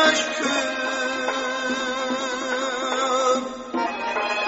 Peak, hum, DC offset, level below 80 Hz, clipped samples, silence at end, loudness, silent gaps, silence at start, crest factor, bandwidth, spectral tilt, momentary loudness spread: -6 dBFS; none; under 0.1%; -62 dBFS; under 0.1%; 0 s; -24 LUFS; none; 0 s; 18 dB; 8 kHz; 1 dB/octave; 4 LU